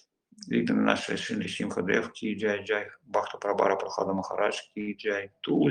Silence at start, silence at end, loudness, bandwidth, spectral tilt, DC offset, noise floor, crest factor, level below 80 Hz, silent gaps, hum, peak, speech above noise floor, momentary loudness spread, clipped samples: 0.4 s; 0 s; -29 LUFS; 10.5 kHz; -5 dB/octave; under 0.1%; -50 dBFS; 24 dB; -70 dBFS; none; none; -4 dBFS; 21 dB; 7 LU; under 0.1%